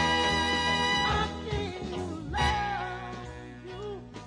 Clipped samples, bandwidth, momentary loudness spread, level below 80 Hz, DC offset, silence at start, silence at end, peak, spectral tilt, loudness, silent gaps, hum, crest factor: under 0.1%; 10.5 kHz; 15 LU; -42 dBFS; under 0.1%; 0 s; 0 s; -14 dBFS; -4 dB/octave; -29 LUFS; none; none; 16 dB